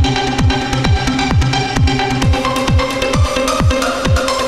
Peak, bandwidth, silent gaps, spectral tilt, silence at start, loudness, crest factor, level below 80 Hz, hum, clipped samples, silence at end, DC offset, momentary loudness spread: 0 dBFS; 15 kHz; none; -5 dB/octave; 0 s; -14 LUFS; 14 dB; -22 dBFS; none; under 0.1%; 0 s; under 0.1%; 1 LU